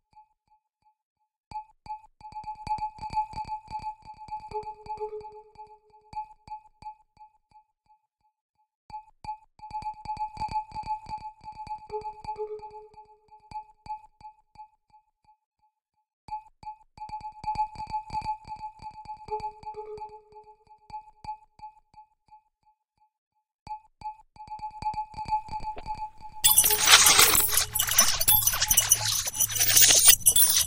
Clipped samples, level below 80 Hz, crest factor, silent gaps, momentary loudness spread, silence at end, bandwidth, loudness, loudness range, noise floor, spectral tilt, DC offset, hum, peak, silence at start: under 0.1%; -50 dBFS; 28 dB; 8.41-8.54 s, 8.75-8.89 s, 15.46-15.51 s, 16.13-16.28 s, 23.18-23.31 s, 23.54-23.66 s; 27 LU; 0 s; 16 kHz; -21 LUFS; 28 LU; -70 dBFS; 1 dB/octave; under 0.1%; none; -2 dBFS; 1.5 s